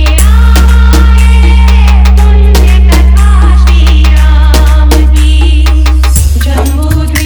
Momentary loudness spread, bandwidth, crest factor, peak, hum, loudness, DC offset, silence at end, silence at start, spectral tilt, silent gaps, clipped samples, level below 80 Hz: 3 LU; 19 kHz; 4 dB; 0 dBFS; none; -6 LUFS; under 0.1%; 0 s; 0 s; -5.5 dB/octave; none; 7%; -4 dBFS